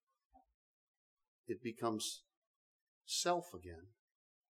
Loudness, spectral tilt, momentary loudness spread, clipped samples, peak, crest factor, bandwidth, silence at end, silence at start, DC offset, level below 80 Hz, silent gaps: -40 LUFS; -3 dB/octave; 19 LU; under 0.1%; -22 dBFS; 24 dB; 17.5 kHz; 0.6 s; 0.35 s; under 0.1%; -76 dBFS; 0.54-1.17 s, 1.28-1.44 s, 2.37-3.01 s